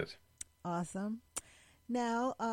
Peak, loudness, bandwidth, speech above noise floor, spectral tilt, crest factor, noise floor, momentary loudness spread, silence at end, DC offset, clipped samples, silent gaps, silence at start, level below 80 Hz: -20 dBFS; -39 LUFS; 16.5 kHz; 21 dB; -5 dB/octave; 20 dB; -57 dBFS; 14 LU; 0 s; under 0.1%; under 0.1%; none; 0 s; -70 dBFS